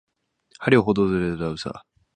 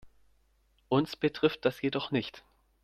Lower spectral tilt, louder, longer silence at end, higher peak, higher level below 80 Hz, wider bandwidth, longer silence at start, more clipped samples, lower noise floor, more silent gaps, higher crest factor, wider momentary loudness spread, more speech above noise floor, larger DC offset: about the same, -7 dB/octave vs -6.5 dB/octave; first, -22 LUFS vs -30 LUFS; about the same, 0.35 s vs 0.45 s; first, -2 dBFS vs -12 dBFS; first, -48 dBFS vs -66 dBFS; second, 9.8 kHz vs 14.5 kHz; first, 0.6 s vs 0.05 s; neither; second, -57 dBFS vs -69 dBFS; neither; about the same, 22 dB vs 20 dB; first, 15 LU vs 5 LU; second, 35 dB vs 39 dB; neither